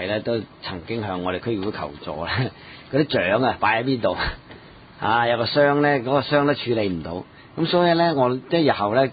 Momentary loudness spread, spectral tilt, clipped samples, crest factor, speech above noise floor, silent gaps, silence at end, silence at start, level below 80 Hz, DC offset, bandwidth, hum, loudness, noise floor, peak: 13 LU; -11 dB/octave; under 0.1%; 16 dB; 22 dB; none; 0 s; 0 s; -46 dBFS; under 0.1%; 5 kHz; none; -22 LUFS; -44 dBFS; -6 dBFS